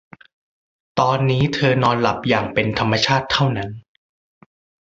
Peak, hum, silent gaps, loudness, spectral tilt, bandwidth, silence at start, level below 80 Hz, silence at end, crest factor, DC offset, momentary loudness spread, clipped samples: -2 dBFS; none; none; -18 LUFS; -5.5 dB/octave; 7.8 kHz; 0.95 s; -48 dBFS; 1.05 s; 18 dB; under 0.1%; 9 LU; under 0.1%